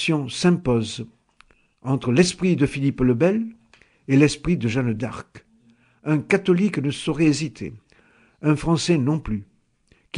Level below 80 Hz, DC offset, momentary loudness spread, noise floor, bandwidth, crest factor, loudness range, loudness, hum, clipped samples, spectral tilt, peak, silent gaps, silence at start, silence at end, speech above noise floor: -46 dBFS; under 0.1%; 15 LU; -61 dBFS; 10.5 kHz; 20 dB; 3 LU; -21 LUFS; none; under 0.1%; -6 dB/octave; -4 dBFS; none; 0 s; 0 s; 40 dB